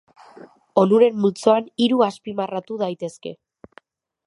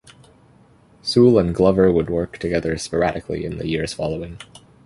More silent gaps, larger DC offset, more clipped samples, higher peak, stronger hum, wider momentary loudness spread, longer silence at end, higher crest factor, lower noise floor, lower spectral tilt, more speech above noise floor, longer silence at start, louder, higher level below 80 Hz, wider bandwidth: neither; neither; neither; about the same, -2 dBFS vs -2 dBFS; neither; about the same, 15 LU vs 14 LU; first, 0.95 s vs 0.45 s; about the same, 20 dB vs 18 dB; about the same, -53 dBFS vs -52 dBFS; about the same, -6.5 dB/octave vs -6.5 dB/octave; about the same, 34 dB vs 33 dB; second, 0.75 s vs 1.05 s; about the same, -20 LUFS vs -20 LUFS; second, -70 dBFS vs -40 dBFS; about the same, 11 kHz vs 11.5 kHz